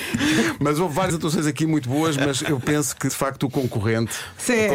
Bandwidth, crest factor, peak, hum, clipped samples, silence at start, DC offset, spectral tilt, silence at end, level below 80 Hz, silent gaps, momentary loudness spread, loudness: 16.5 kHz; 12 dB; -10 dBFS; none; under 0.1%; 0 s; under 0.1%; -4.5 dB/octave; 0 s; -50 dBFS; none; 4 LU; -22 LUFS